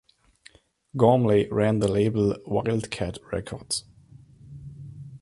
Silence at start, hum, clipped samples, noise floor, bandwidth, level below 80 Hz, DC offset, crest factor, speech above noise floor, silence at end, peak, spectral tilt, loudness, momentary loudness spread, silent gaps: 0.95 s; none; under 0.1%; -56 dBFS; 11.5 kHz; -50 dBFS; under 0.1%; 20 dB; 33 dB; 0.05 s; -4 dBFS; -6 dB/octave; -24 LUFS; 22 LU; none